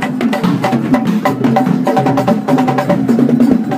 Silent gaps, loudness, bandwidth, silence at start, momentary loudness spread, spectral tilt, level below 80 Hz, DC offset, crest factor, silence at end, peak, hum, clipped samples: none; -13 LUFS; 15.5 kHz; 0 s; 3 LU; -7.5 dB/octave; -50 dBFS; under 0.1%; 12 dB; 0 s; 0 dBFS; none; under 0.1%